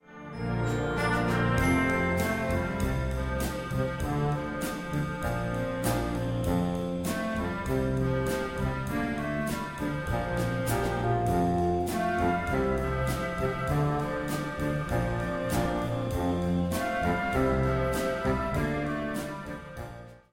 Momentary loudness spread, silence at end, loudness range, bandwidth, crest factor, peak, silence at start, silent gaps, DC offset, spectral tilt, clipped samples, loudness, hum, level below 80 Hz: 6 LU; 0.15 s; 3 LU; 16.5 kHz; 14 dB; -14 dBFS; 0.1 s; none; under 0.1%; -6.5 dB/octave; under 0.1%; -29 LUFS; none; -40 dBFS